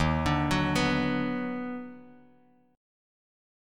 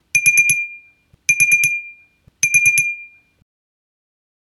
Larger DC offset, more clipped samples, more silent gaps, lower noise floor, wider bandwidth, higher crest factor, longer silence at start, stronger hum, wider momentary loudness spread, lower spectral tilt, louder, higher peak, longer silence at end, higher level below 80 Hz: neither; neither; neither; first, -62 dBFS vs -52 dBFS; second, 15.5 kHz vs 18.5 kHz; about the same, 18 dB vs 18 dB; second, 0 s vs 0.15 s; neither; about the same, 12 LU vs 12 LU; first, -5.5 dB/octave vs 1 dB/octave; second, -28 LUFS vs -14 LUFS; second, -12 dBFS vs 0 dBFS; second, 1 s vs 1.35 s; first, -44 dBFS vs -62 dBFS